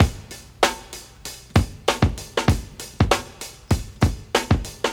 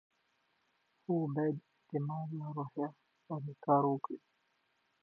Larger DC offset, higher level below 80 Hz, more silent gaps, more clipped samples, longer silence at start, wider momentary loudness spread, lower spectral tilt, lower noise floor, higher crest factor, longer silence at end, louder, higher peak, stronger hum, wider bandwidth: neither; first, -32 dBFS vs -90 dBFS; neither; neither; second, 0 s vs 1.1 s; about the same, 15 LU vs 14 LU; second, -5 dB/octave vs -10.5 dB/octave; second, -40 dBFS vs -78 dBFS; about the same, 22 dB vs 22 dB; second, 0 s vs 0.85 s; first, -23 LUFS vs -37 LUFS; first, 0 dBFS vs -16 dBFS; neither; first, 18.5 kHz vs 4.3 kHz